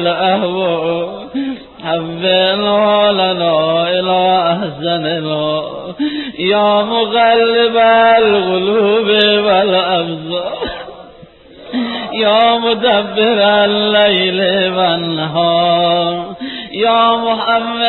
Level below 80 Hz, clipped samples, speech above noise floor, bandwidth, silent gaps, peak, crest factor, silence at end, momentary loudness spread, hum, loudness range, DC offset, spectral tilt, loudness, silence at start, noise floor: -50 dBFS; under 0.1%; 27 dB; 4.3 kHz; none; 0 dBFS; 14 dB; 0 s; 11 LU; none; 4 LU; under 0.1%; -8 dB/octave; -13 LUFS; 0 s; -39 dBFS